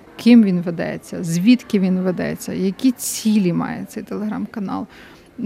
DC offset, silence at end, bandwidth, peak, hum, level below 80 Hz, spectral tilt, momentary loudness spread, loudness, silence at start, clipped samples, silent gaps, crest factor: under 0.1%; 0 s; 16 kHz; -2 dBFS; none; -58 dBFS; -6 dB/octave; 14 LU; -19 LUFS; 0.15 s; under 0.1%; none; 16 dB